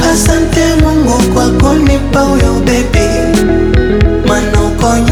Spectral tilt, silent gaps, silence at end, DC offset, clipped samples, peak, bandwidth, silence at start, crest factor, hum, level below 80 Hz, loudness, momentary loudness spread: -5.5 dB/octave; none; 0 s; under 0.1%; under 0.1%; 0 dBFS; 19.5 kHz; 0 s; 8 dB; none; -16 dBFS; -10 LUFS; 2 LU